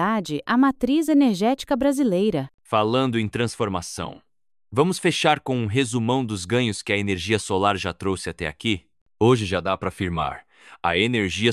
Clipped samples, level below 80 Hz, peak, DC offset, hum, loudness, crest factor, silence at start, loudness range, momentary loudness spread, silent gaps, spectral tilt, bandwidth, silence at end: under 0.1%; -46 dBFS; -4 dBFS; under 0.1%; none; -22 LUFS; 18 dB; 0 s; 3 LU; 8 LU; 2.54-2.58 s, 9.01-9.06 s; -5 dB/octave; 14.5 kHz; 0 s